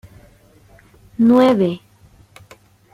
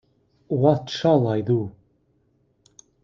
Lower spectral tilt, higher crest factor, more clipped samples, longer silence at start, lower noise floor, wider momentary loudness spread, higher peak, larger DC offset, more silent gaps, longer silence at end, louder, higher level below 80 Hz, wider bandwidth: about the same, -7.5 dB/octave vs -7.5 dB/octave; about the same, 18 dB vs 20 dB; neither; first, 1.2 s vs 0.5 s; second, -49 dBFS vs -65 dBFS; first, 21 LU vs 8 LU; about the same, -2 dBFS vs -4 dBFS; neither; neither; second, 1.15 s vs 1.35 s; first, -15 LUFS vs -22 LUFS; first, -54 dBFS vs -62 dBFS; first, 12 kHz vs 7.4 kHz